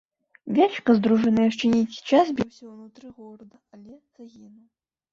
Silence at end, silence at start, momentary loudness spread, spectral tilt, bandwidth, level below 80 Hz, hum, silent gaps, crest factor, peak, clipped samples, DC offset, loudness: 0.85 s; 0.45 s; 12 LU; -6.5 dB/octave; 7.4 kHz; -62 dBFS; none; none; 18 dB; -6 dBFS; under 0.1%; under 0.1%; -22 LUFS